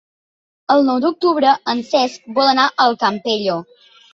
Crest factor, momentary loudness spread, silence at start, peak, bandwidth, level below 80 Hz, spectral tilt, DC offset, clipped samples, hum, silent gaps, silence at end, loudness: 16 dB; 6 LU; 0.7 s; -2 dBFS; 7.8 kHz; -66 dBFS; -4 dB/octave; under 0.1%; under 0.1%; none; none; 0.5 s; -16 LUFS